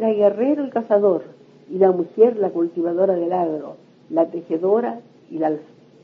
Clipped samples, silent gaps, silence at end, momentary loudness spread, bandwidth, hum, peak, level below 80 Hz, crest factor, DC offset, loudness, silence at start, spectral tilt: under 0.1%; none; 0.4 s; 13 LU; 5.2 kHz; none; -2 dBFS; -76 dBFS; 18 dB; under 0.1%; -20 LUFS; 0 s; -10 dB/octave